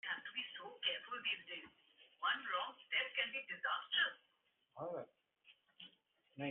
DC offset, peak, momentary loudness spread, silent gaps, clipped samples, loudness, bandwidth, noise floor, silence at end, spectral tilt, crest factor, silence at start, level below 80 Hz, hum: under 0.1%; -24 dBFS; 22 LU; none; under 0.1%; -41 LUFS; 4 kHz; -81 dBFS; 0 s; 1 dB/octave; 20 dB; 0.05 s; under -90 dBFS; none